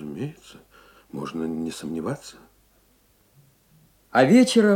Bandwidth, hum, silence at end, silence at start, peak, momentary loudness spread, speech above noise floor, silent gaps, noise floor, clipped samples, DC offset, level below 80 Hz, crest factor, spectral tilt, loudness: 15.5 kHz; none; 0 s; 0 s; -6 dBFS; 20 LU; 40 dB; none; -61 dBFS; under 0.1%; under 0.1%; -64 dBFS; 20 dB; -5.5 dB/octave; -23 LUFS